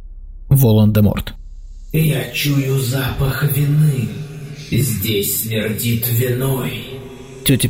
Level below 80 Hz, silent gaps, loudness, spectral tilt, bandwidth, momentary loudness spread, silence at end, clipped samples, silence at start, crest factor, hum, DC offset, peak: -34 dBFS; none; -17 LUFS; -5.5 dB/octave; 16.5 kHz; 15 LU; 0 s; under 0.1%; 0 s; 14 dB; none; under 0.1%; -4 dBFS